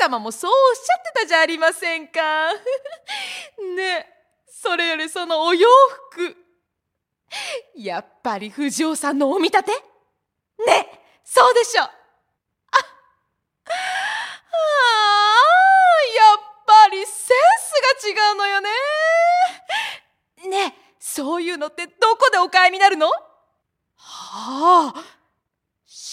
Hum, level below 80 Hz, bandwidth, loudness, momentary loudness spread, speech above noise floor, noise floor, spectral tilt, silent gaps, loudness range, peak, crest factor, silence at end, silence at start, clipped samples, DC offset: none; -76 dBFS; 15.5 kHz; -17 LUFS; 17 LU; 61 dB; -79 dBFS; -1 dB/octave; none; 9 LU; 0 dBFS; 18 dB; 0 s; 0 s; under 0.1%; under 0.1%